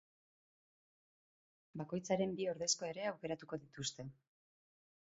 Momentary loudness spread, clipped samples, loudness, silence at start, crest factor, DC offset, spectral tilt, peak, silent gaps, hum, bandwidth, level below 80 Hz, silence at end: 14 LU; under 0.1%; -41 LUFS; 1.75 s; 22 dB; under 0.1%; -4 dB/octave; -22 dBFS; none; none; 7.6 kHz; -78 dBFS; 0.95 s